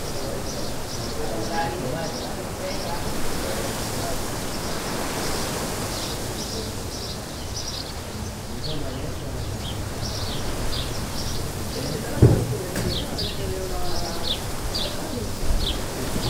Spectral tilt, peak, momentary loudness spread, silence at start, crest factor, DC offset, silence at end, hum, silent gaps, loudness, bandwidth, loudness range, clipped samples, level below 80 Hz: -4.5 dB/octave; -2 dBFS; 5 LU; 0 s; 24 dB; under 0.1%; 0 s; none; none; -27 LUFS; 16 kHz; 6 LU; under 0.1%; -34 dBFS